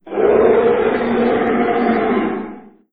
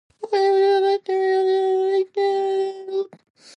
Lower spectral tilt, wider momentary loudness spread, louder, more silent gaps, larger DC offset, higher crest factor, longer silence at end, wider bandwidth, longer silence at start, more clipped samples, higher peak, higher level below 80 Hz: first, -9.5 dB/octave vs -4 dB/octave; about the same, 9 LU vs 10 LU; first, -15 LUFS vs -20 LUFS; neither; neither; about the same, 14 dB vs 12 dB; second, 0.35 s vs 0.5 s; second, 4.9 kHz vs 8.6 kHz; second, 0.05 s vs 0.2 s; neither; first, -2 dBFS vs -10 dBFS; first, -46 dBFS vs -80 dBFS